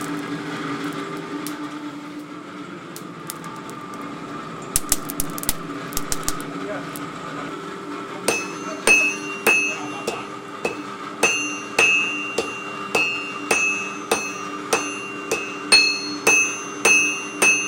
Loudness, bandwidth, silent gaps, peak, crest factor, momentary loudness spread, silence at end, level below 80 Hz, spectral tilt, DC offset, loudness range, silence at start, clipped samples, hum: -21 LUFS; 17 kHz; none; 0 dBFS; 24 dB; 18 LU; 0 s; -48 dBFS; -1.5 dB/octave; under 0.1%; 12 LU; 0 s; under 0.1%; none